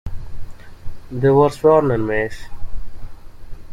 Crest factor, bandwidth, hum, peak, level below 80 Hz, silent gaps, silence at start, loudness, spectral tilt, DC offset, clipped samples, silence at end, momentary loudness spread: 16 dB; 12.5 kHz; none; -2 dBFS; -32 dBFS; none; 0.05 s; -16 LUFS; -8 dB/octave; under 0.1%; under 0.1%; 0 s; 24 LU